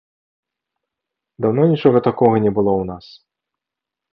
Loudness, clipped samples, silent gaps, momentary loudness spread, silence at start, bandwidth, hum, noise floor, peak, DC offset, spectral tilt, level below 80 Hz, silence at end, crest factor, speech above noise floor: -16 LUFS; under 0.1%; none; 9 LU; 1.4 s; 5.8 kHz; none; -85 dBFS; -2 dBFS; under 0.1%; -11 dB/octave; -52 dBFS; 1.15 s; 18 dB; 69 dB